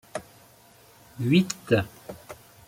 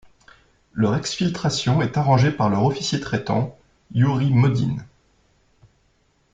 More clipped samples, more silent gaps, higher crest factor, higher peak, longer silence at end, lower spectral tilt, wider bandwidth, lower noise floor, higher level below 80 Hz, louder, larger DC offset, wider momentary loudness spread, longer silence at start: neither; neither; about the same, 20 dB vs 18 dB; second, -8 dBFS vs -4 dBFS; second, 0.35 s vs 1.45 s; about the same, -5.5 dB/octave vs -6 dB/octave; first, 16.5 kHz vs 9 kHz; second, -55 dBFS vs -63 dBFS; second, -60 dBFS vs -52 dBFS; second, -25 LUFS vs -21 LUFS; neither; first, 21 LU vs 8 LU; second, 0.15 s vs 0.75 s